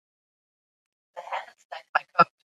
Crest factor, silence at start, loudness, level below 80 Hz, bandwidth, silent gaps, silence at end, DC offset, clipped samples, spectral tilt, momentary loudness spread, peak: 26 dB; 1.15 s; -26 LUFS; -80 dBFS; 7.8 kHz; 1.65-1.70 s, 1.89-1.93 s; 0.35 s; under 0.1%; under 0.1%; -5 dB/octave; 22 LU; -4 dBFS